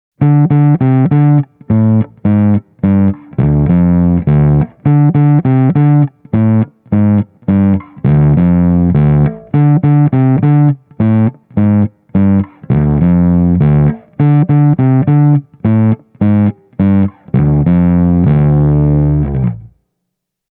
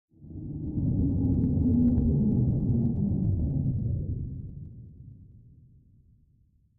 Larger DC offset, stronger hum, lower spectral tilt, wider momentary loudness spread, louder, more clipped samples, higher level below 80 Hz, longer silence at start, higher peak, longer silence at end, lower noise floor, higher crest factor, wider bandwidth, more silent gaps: neither; neither; about the same, -14 dB/octave vs -15 dB/octave; second, 5 LU vs 19 LU; first, -11 LUFS vs -27 LUFS; neither; first, -28 dBFS vs -38 dBFS; about the same, 0.2 s vs 0.2 s; first, 0 dBFS vs -14 dBFS; second, 0.9 s vs 1.4 s; first, -74 dBFS vs -64 dBFS; about the same, 10 dB vs 14 dB; first, 3.5 kHz vs 1.2 kHz; neither